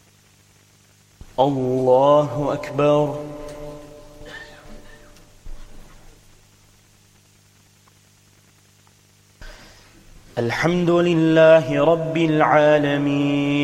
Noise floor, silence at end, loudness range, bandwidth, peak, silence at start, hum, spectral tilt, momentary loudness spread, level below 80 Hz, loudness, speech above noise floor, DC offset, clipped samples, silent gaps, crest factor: -55 dBFS; 0 s; 19 LU; 13 kHz; -2 dBFS; 1.4 s; 50 Hz at -55 dBFS; -7 dB/octave; 23 LU; -46 dBFS; -18 LUFS; 38 dB; under 0.1%; under 0.1%; none; 20 dB